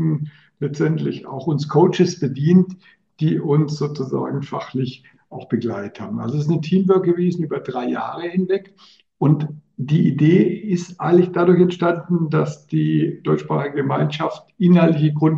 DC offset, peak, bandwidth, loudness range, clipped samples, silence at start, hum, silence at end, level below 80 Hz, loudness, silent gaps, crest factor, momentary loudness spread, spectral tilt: under 0.1%; -2 dBFS; 7.4 kHz; 6 LU; under 0.1%; 0 s; none; 0 s; -66 dBFS; -19 LUFS; none; 16 dB; 11 LU; -8.5 dB/octave